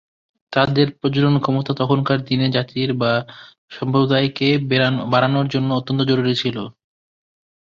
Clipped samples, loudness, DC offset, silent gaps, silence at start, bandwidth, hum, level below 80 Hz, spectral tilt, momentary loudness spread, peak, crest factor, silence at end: under 0.1%; -19 LUFS; under 0.1%; 3.58-3.68 s; 0.5 s; 7.2 kHz; none; -54 dBFS; -7.5 dB/octave; 7 LU; -2 dBFS; 18 dB; 1.05 s